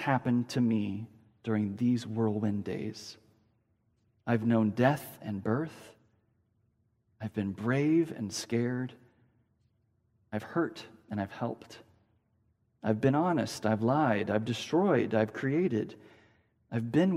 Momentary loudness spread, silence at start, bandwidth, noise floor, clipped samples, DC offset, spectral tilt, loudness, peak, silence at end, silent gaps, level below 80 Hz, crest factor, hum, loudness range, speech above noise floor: 14 LU; 0 s; 16 kHz; -73 dBFS; under 0.1%; under 0.1%; -7 dB/octave; -31 LUFS; -12 dBFS; 0 s; none; -72 dBFS; 20 dB; none; 8 LU; 43 dB